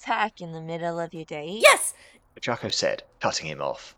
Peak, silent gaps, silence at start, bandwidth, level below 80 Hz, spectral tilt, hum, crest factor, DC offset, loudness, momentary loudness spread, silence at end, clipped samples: -4 dBFS; none; 0 s; over 20 kHz; -64 dBFS; -2 dB/octave; none; 22 dB; under 0.1%; -24 LUFS; 17 LU; 0.1 s; under 0.1%